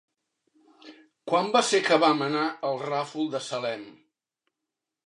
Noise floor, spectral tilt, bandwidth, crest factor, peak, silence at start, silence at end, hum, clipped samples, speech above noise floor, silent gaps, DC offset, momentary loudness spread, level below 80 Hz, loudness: -86 dBFS; -3.5 dB/octave; 11.5 kHz; 22 dB; -6 dBFS; 0.85 s; 1.15 s; none; under 0.1%; 61 dB; none; under 0.1%; 11 LU; -84 dBFS; -25 LUFS